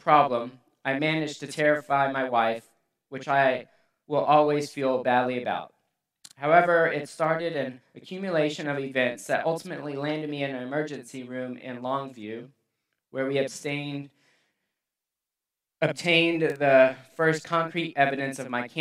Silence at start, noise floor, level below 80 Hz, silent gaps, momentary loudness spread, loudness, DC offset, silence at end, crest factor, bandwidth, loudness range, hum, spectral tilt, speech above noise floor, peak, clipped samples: 0.05 s; -88 dBFS; -80 dBFS; none; 15 LU; -26 LUFS; under 0.1%; 0 s; 22 dB; 13.5 kHz; 9 LU; none; -5 dB/octave; 63 dB; -4 dBFS; under 0.1%